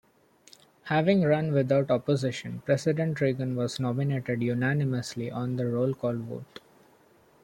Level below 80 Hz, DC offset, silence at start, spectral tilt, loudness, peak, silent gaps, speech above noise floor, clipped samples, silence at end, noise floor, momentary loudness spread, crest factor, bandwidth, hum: -66 dBFS; under 0.1%; 0.85 s; -7 dB/octave; -28 LUFS; -10 dBFS; none; 33 dB; under 0.1%; 1 s; -60 dBFS; 10 LU; 18 dB; 16.5 kHz; none